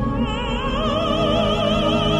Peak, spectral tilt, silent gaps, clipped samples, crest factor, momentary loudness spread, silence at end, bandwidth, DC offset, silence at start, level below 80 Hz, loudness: -6 dBFS; -6 dB/octave; none; under 0.1%; 14 dB; 4 LU; 0 s; 12.5 kHz; under 0.1%; 0 s; -30 dBFS; -20 LUFS